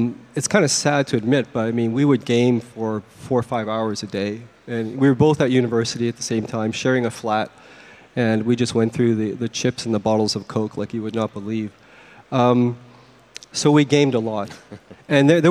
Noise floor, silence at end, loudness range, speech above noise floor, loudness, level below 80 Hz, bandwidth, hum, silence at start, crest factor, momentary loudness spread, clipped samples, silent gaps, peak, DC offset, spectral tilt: -47 dBFS; 0 s; 3 LU; 27 dB; -20 LUFS; -58 dBFS; 13.5 kHz; none; 0 s; 20 dB; 11 LU; under 0.1%; none; 0 dBFS; under 0.1%; -5.5 dB/octave